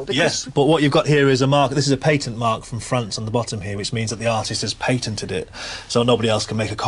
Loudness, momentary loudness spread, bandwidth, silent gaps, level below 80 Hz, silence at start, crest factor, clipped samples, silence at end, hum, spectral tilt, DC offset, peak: -20 LUFS; 10 LU; 11.5 kHz; none; -46 dBFS; 0 s; 14 dB; under 0.1%; 0 s; none; -5 dB/octave; under 0.1%; -4 dBFS